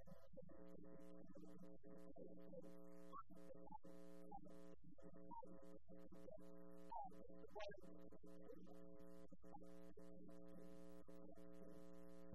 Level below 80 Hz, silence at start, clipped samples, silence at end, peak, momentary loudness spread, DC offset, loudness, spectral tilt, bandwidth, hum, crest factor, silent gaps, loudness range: -76 dBFS; 0 s; under 0.1%; 0 s; -40 dBFS; 7 LU; 0.2%; -63 LUFS; -7 dB/octave; 13 kHz; none; 20 dB; none; 3 LU